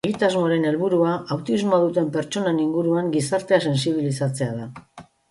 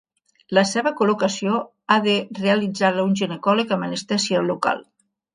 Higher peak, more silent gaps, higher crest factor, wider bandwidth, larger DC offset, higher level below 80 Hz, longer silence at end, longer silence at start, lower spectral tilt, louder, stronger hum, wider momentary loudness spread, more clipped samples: second, -6 dBFS vs -2 dBFS; neither; about the same, 16 dB vs 20 dB; about the same, 11.5 kHz vs 10.5 kHz; neither; first, -62 dBFS vs -68 dBFS; second, 0.3 s vs 0.55 s; second, 0.05 s vs 0.5 s; first, -6 dB/octave vs -4.5 dB/octave; about the same, -22 LUFS vs -21 LUFS; neither; about the same, 6 LU vs 5 LU; neither